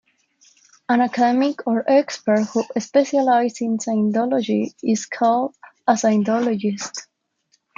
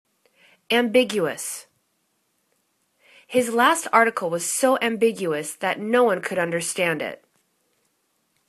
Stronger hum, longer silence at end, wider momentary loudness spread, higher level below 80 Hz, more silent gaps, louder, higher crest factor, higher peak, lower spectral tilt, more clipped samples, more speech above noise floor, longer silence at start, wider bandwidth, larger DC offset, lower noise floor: neither; second, 0.75 s vs 1.35 s; second, 7 LU vs 10 LU; about the same, -72 dBFS vs -72 dBFS; neither; about the same, -20 LUFS vs -22 LUFS; second, 16 dB vs 22 dB; about the same, -4 dBFS vs -2 dBFS; first, -5 dB/octave vs -3 dB/octave; neither; about the same, 47 dB vs 49 dB; first, 0.9 s vs 0.7 s; second, 7.6 kHz vs 14 kHz; neither; second, -66 dBFS vs -71 dBFS